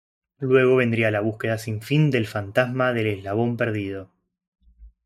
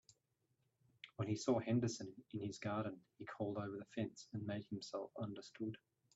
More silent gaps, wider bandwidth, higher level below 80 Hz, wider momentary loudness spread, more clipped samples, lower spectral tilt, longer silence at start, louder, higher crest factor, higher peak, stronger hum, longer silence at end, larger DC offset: first, 4.47-4.52 s vs none; first, 15 kHz vs 8 kHz; first, -58 dBFS vs -80 dBFS; about the same, 10 LU vs 11 LU; neither; about the same, -7 dB/octave vs -6 dB/octave; second, 0.4 s vs 1.05 s; first, -22 LUFS vs -44 LUFS; about the same, 18 dB vs 20 dB; first, -4 dBFS vs -24 dBFS; neither; second, 0.15 s vs 0.4 s; neither